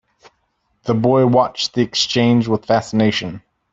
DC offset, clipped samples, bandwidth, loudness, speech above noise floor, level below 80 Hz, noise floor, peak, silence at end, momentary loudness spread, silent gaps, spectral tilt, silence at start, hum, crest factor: under 0.1%; under 0.1%; 7.8 kHz; -16 LUFS; 51 dB; -54 dBFS; -67 dBFS; -2 dBFS; 0.35 s; 11 LU; none; -5.5 dB/octave; 0.85 s; none; 16 dB